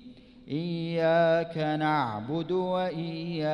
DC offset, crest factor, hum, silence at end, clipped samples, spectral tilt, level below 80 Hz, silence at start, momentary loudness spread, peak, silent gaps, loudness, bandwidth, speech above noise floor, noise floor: under 0.1%; 14 dB; none; 0 s; under 0.1%; -8 dB/octave; -64 dBFS; 0 s; 10 LU; -14 dBFS; none; -28 LUFS; 10 kHz; 22 dB; -49 dBFS